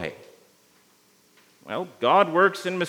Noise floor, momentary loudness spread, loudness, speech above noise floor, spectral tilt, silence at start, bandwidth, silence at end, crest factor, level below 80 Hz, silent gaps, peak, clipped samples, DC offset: -60 dBFS; 15 LU; -22 LUFS; 38 dB; -5 dB/octave; 0 s; 19.5 kHz; 0 s; 20 dB; -74 dBFS; none; -4 dBFS; under 0.1%; under 0.1%